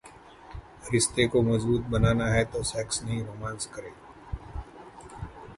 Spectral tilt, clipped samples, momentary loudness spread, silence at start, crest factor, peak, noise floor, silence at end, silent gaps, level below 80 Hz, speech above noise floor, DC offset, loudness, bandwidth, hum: -5 dB/octave; under 0.1%; 22 LU; 0.05 s; 20 dB; -8 dBFS; -50 dBFS; 0 s; none; -44 dBFS; 23 dB; under 0.1%; -27 LUFS; 11.5 kHz; none